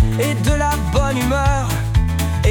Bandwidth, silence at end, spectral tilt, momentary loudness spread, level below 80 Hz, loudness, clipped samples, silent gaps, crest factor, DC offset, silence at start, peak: 19.5 kHz; 0 s; -5.5 dB/octave; 1 LU; -22 dBFS; -18 LUFS; under 0.1%; none; 12 dB; under 0.1%; 0 s; -4 dBFS